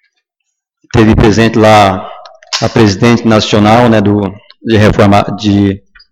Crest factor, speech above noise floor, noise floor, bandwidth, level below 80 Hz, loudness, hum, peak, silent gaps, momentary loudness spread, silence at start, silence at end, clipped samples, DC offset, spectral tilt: 8 dB; 63 dB; -70 dBFS; 12.5 kHz; -28 dBFS; -8 LUFS; none; 0 dBFS; none; 12 LU; 0.95 s; 0.35 s; 0.2%; under 0.1%; -6 dB/octave